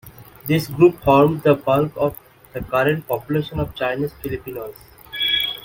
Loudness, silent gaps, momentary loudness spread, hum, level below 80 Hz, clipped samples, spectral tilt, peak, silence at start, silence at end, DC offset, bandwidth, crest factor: -19 LUFS; none; 18 LU; none; -44 dBFS; under 0.1%; -6.5 dB/octave; -2 dBFS; 0.05 s; 0 s; under 0.1%; 17 kHz; 18 dB